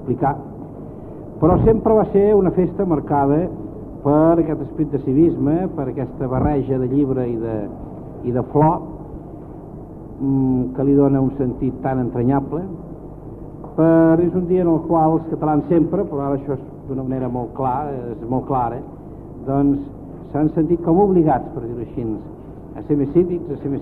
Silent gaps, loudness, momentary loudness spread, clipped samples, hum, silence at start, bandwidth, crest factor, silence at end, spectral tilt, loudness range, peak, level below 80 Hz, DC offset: none; -19 LUFS; 20 LU; under 0.1%; none; 0 s; 3.7 kHz; 18 dB; 0 s; -12 dB/octave; 5 LU; 0 dBFS; -38 dBFS; under 0.1%